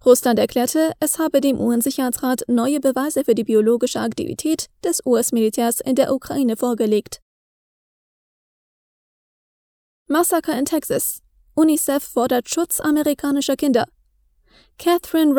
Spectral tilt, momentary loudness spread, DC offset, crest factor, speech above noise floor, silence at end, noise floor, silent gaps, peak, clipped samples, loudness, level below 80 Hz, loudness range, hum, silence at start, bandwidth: -3.5 dB/octave; 6 LU; under 0.1%; 20 dB; 42 dB; 0 s; -60 dBFS; 7.22-10.06 s; 0 dBFS; under 0.1%; -19 LUFS; -56 dBFS; 7 LU; none; 0.05 s; over 20 kHz